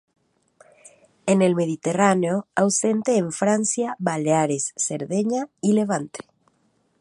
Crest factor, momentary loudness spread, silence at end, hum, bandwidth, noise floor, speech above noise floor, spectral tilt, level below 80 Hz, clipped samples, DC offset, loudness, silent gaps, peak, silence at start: 20 dB; 7 LU; 0.8 s; none; 11.5 kHz; -66 dBFS; 45 dB; -5 dB/octave; -68 dBFS; under 0.1%; under 0.1%; -22 LUFS; none; -2 dBFS; 1.25 s